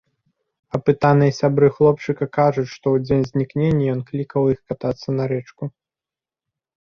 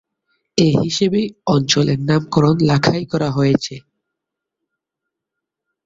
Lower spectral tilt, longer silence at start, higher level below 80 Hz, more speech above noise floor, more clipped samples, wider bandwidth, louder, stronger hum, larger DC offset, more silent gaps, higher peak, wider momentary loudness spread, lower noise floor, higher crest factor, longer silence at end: first, -8.5 dB/octave vs -5.5 dB/octave; first, 0.75 s vs 0.55 s; about the same, -50 dBFS vs -50 dBFS; first, 71 dB vs 66 dB; neither; second, 6.8 kHz vs 7.8 kHz; second, -19 LUFS vs -16 LUFS; neither; neither; neither; about the same, -2 dBFS vs 0 dBFS; first, 10 LU vs 5 LU; first, -90 dBFS vs -82 dBFS; about the same, 18 dB vs 18 dB; second, 1.15 s vs 2.05 s